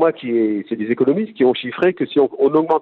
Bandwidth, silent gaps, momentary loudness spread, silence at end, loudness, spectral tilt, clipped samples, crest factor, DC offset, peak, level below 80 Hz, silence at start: 4.4 kHz; none; 4 LU; 0 s; -18 LUFS; -9 dB/octave; under 0.1%; 14 dB; under 0.1%; -4 dBFS; -64 dBFS; 0 s